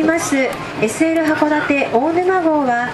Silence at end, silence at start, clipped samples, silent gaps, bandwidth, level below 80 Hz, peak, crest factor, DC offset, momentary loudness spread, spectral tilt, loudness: 0 s; 0 s; under 0.1%; none; 13 kHz; -50 dBFS; -2 dBFS; 14 dB; under 0.1%; 4 LU; -4.5 dB/octave; -16 LUFS